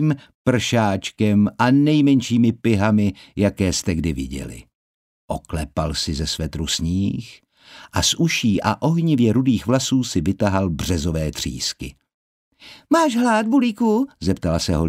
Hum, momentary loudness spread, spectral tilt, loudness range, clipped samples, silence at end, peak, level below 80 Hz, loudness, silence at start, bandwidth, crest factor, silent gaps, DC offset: none; 10 LU; -5 dB/octave; 7 LU; under 0.1%; 0 s; -2 dBFS; -38 dBFS; -20 LUFS; 0 s; 16 kHz; 18 dB; 0.35-0.45 s, 4.75-5.28 s, 12.14-12.52 s; under 0.1%